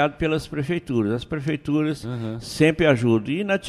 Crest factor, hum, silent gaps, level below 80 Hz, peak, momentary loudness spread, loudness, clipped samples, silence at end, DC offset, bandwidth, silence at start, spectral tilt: 18 dB; none; none; -46 dBFS; -4 dBFS; 11 LU; -23 LUFS; under 0.1%; 0 s; under 0.1%; 13 kHz; 0 s; -6.5 dB/octave